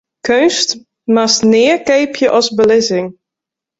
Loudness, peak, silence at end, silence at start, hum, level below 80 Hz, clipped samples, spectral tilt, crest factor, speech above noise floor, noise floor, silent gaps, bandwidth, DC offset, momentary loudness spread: -12 LUFS; 0 dBFS; 0.7 s; 0.25 s; none; -54 dBFS; under 0.1%; -3 dB/octave; 12 dB; 72 dB; -84 dBFS; none; 8 kHz; under 0.1%; 7 LU